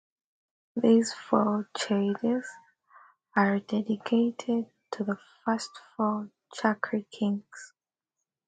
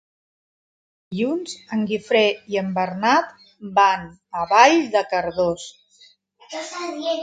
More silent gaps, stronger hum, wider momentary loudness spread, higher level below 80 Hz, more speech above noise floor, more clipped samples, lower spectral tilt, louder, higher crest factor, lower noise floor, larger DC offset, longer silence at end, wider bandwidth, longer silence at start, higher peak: neither; neither; second, 12 LU vs 18 LU; second, -76 dBFS vs -60 dBFS; first, 59 dB vs 34 dB; neither; first, -5.5 dB/octave vs -4 dB/octave; second, -29 LUFS vs -20 LUFS; about the same, 20 dB vs 20 dB; first, -87 dBFS vs -54 dBFS; neither; first, 0.8 s vs 0 s; about the same, 9.4 kHz vs 9.4 kHz; second, 0.75 s vs 1.1 s; second, -8 dBFS vs 0 dBFS